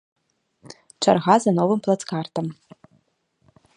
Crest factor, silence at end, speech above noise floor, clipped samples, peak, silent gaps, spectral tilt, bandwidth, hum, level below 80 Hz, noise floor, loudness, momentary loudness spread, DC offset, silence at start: 22 dB; 1.25 s; 47 dB; under 0.1%; -2 dBFS; none; -5.5 dB/octave; 11 kHz; none; -66 dBFS; -67 dBFS; -21 LUFS; 12 LU; under 0.1%; 0.7 s